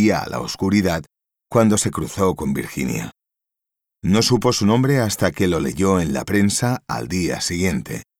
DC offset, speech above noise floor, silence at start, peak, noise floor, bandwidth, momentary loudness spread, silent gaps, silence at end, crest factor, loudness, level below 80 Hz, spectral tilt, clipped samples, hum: under 0.1%; 65 dB; 0 s; -4 dBFS; -85 dBFS; 17.5 kHz; 9 LU; none; 0.15 s; 16 dB; -20 LUFS; -44 dBFS; -5 dB/octave; under 0.1%; none